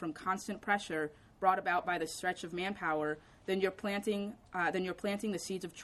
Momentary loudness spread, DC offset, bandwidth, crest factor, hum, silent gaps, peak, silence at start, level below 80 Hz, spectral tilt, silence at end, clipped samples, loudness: 6 LU; under 0.1%; 13.5 kHz; 22 dB; none; none; -14 dBFS; 0 s; -68 dBFS; -4.5 dB/octave; 0 s; under 0.1%; -36 LUFS